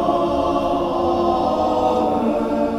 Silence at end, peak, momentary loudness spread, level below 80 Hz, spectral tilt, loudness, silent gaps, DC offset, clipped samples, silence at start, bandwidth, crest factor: 0 s; -6 dBFS; 2 LU; -40 dBFS; -7 dB/octave; -19 LUFS; none; under 0.1%; under 0.1%; 0 s; 13.5 kHz; 12 dB